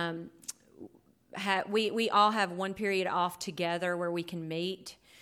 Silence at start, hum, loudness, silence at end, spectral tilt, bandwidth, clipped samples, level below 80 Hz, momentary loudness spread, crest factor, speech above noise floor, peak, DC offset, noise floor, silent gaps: 0 s; none; -31 LUFS; 0.3 s; -4 dB/octave; 18 kHz; under 0.1%; -74 dBFS; 18 LU; 20 dB; 24 dB; -12 dBFS; under 0.1%; -56 dBFS; none